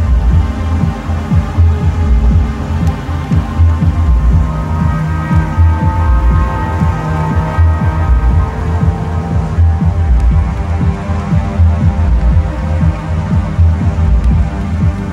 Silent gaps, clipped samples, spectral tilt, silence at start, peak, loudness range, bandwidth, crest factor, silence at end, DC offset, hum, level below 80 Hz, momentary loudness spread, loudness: none; under 0.1%; -8.5 dB/octave; 0 s; 0 dBFS; 1 LU; 7.6 kHz; 10 dB; 0 s; under 0.1%; none; -14 dBFS; 4 LU; -13 LUFS